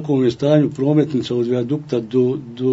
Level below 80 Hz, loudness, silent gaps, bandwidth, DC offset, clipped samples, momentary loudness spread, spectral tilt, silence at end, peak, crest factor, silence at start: -58 dBFS; -18 LUFS; none; 8 kHz; under 0.1%; under 0.1%; 5 LU; -8.5 dB/octave; 0 s; -2 dBFS; 16 dB; 0 s